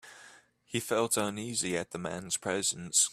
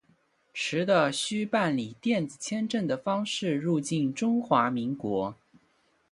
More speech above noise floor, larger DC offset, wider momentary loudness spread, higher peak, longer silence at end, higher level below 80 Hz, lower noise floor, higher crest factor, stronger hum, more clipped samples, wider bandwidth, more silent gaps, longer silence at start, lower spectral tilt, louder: second, 26 dB vs 41 dB; neither; first, 10 LU vs 7 LU; second, -14 dBFS vs -8 dBFS; second, 0 s vs 0.75 s; about the same, -70 dBFS vs -70 dBFS; second, -58 dBFS vs -68 dBFS; about the same, 20 dB vs 20 dB; first, 60 Hz at -60 dBFS vs none; neither; first, 15.5 kHz vs 11.5 kHz; neither; second, 0.05 s vs 0.55 s; second, -2.5 dB/octave vs -5 dB/octave; second, -31 LUFS vs -28 LUFS